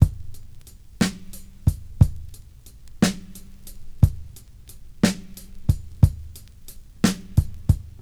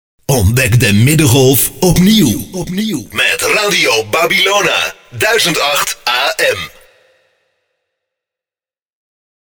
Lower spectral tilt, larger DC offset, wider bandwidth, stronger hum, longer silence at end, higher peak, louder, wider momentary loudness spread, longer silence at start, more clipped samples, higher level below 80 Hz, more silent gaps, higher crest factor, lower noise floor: first, -6 dB/octave vs -4 dB/octave; first, 0.2% vs under 0.1%; second, 18 kHz vs over 20 kHz; neither; second, 0 s vs 2.8 s; about the same, 0 dBFS vs 0 dBFS; second, -24 LUFS vs -11 LUFS; first, 24 LU vs 9 LU; second, 0 s vs 0.3 s; neither; about the same, -32 dBFS vs -34 dBFS; neither; first, 24 dB vs 14 dB; second, -44 dBFS vs under -90 dBFS